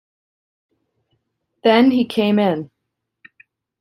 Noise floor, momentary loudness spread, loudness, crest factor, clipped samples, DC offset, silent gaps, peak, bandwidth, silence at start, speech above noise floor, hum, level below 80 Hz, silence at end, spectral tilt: -78 dBFS; 11 LU; -17 LUFS; 18 dB; under 0.1%; under 0.1%; none; -2 dBFS; 13.5 kHz; 1.65 s; 63 dB; none; -64 dBFS; 1.15 s; -7 dB/octave